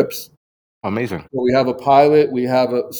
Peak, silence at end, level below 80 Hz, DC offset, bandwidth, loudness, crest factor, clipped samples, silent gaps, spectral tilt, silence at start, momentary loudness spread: 0 dBFS; 0 s; -56 dBFS; under 0.1%; over 20 kHz; -16 LUFS; 16 dB; under 0.1%; 0.37-0.81 s; -6 dB/octave; 0 s; 13 LU